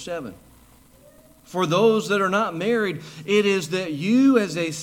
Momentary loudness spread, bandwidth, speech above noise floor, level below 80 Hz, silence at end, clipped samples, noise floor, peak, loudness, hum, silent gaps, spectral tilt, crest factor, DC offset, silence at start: 14 LU; 16.5 kHz; 31 dB; -62 dBFS; 0 s; under 0.1%; -52 dBFS; -6 dBFS; -21 LUFS; none; none; -5 dB/octave; 16 dB; under 0.1%; 0 s